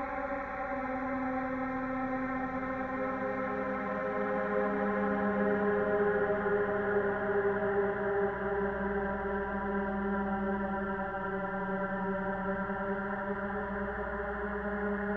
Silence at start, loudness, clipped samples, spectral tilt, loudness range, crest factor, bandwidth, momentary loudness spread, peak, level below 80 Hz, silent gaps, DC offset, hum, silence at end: 0 s; -33 LUFS; under 0.1%; -9.5 dB/octave; 4 LU; 14 dB; 5.8 kHz; 5 LU; -18 dBFS; -52 dBFS; none; under 0.1%; none; 0 s